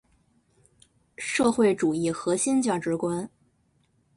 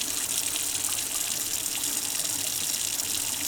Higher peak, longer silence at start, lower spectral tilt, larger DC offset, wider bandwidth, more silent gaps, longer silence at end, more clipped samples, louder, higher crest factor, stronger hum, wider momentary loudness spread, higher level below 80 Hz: about the same, -10 dBFS vs -10 dBFS; first, 1.2 s vs 0 s; first, -4.5 dB/octave vs 0.5 dB/octave; neither; second, 11.5 kHz vs over 20 kHz; neither; first, 0.9 s vs 0 s; neither; about the same, -25 LUFS vs -26 LUFS; about the same, 18 dB vs 20 dB; neither; first, 11 LU vs 1 LU; about the same, -64 dBFS vs -60 dBFS